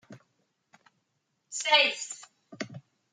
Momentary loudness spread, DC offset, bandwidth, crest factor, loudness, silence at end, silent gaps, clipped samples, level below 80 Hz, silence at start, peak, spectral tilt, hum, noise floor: 19 LU; under 0.1%; 9.6 kHz; 26 dB; -25 LUFS; 0.35 s; none; under 0.1%; -88 dBFS; 0.1 s; -8 dBFS; -0.5 dB/octave; none; -78 dBFS